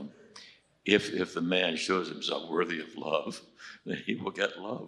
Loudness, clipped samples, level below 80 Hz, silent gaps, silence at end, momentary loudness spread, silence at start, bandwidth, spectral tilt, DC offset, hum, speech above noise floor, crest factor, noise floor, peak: -31 LUFS; under 0.1%; -72 dBFS; none; 0 s; 19 LU; 0 s; 12 kHz; -4 dB/octave; under 0.1%; none; 23 dB; 24 dB; -54 dBFS; -8 dBFS